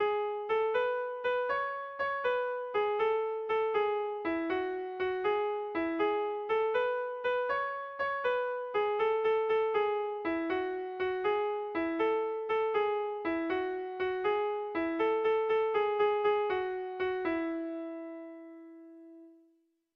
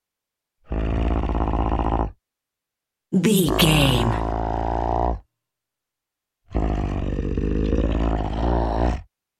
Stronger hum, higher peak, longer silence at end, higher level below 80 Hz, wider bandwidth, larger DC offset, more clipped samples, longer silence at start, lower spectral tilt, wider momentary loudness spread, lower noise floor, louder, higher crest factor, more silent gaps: neither; second, -20 dBFS vs -4 dBFS; first, 0.65 s vs 0.35 s; second, -68 dBFS vs -28 dBFS; second, 5.4 kHz vs 16 kHz; neither; neither; second, 0 s vs 0.7 s; about the same, -6 dB/octave vs -5.5 dB/octave; second, 7 LU vs 10 LU; second, -71 dBFS vs -85 dBFS; second, -32 LUFS vs -23 LUFS; second, 12 dB vs 20 dB; neither